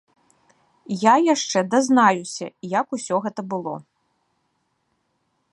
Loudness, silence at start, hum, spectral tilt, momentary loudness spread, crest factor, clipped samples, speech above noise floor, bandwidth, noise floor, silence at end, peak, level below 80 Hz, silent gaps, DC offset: -21 LUFS; 0.9 s; none; -4 dB/octave; 15 LU; 20 dB; under 0.1%; 51 dB; 11.5 kHz; -71 dBFS; 1.7 s; -2 dBFS; -76 dBFS; none; under 0.1%